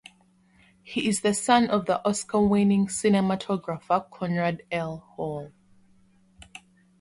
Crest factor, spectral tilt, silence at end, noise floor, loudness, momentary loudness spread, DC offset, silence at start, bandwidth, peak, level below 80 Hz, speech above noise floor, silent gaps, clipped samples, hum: 18 dB; -5 dB/octave; 0.45 s; -61 dBFS; -25 LUFS; 14 LU; under 0.1%; 0.85 s; 11.5 kHz; -8 dBFS; -58 dBFS; 36 dB; none; under 0.1%; none